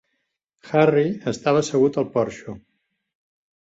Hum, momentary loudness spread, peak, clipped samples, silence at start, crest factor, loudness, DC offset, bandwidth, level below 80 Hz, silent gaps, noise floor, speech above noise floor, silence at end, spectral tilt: none; 18 LU; -4 dBFS; under 0.1%; 0.65 s; 20 dB; -21 LUFS; under 0.1%; 8 kHz; -60 dBFS; none; -75 dBFS; 55 dB; 1.05 s; -6 dB/octave